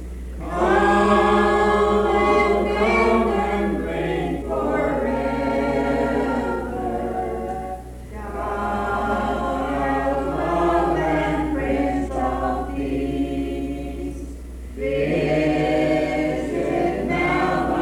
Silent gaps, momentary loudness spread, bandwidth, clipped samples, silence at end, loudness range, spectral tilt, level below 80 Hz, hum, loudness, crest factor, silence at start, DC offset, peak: none; 12 LU; 16 kHz; under 0.1%; 0 s; 7 LU; -6.5 dB/octave; -34 dBFS; none; -21 LUFS; 16 dB; 0 s; under 0.1%; -6 dBFS